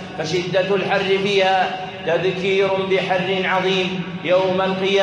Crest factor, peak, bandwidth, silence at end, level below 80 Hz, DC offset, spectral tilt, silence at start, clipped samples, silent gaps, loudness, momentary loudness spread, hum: 14 dB; -4 dBFS; 9.2 kHz; 0 s; -60 dBFS; under 0.1%; -5 dB/octave; 0 s; under 0.1%; none; -19 LUFS; 6 LU; none